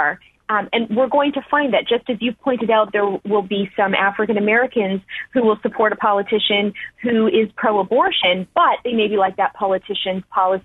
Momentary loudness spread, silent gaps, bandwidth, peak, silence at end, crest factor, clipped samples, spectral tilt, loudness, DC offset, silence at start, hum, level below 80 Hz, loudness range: 6 LU; none; 4.1 kHz; -2 dBFS; 0.05 s; 16 dB; under 0.1%; -7.5 dB/octave; -18 LUFS; under 0.1%; 0 s; none; -58 dBFS; 1 LU